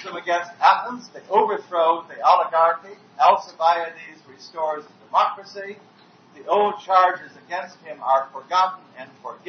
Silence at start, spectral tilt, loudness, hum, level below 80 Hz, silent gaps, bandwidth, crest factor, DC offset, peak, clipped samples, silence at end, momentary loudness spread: 0 s; -3.5 dB/octave; -21 LUFS; none; under -90 dBFS; none; 6.6 kHz; 20 dB; under 0.1%; -2 dBFS; under 0.1%; 0.15 s; 19 LU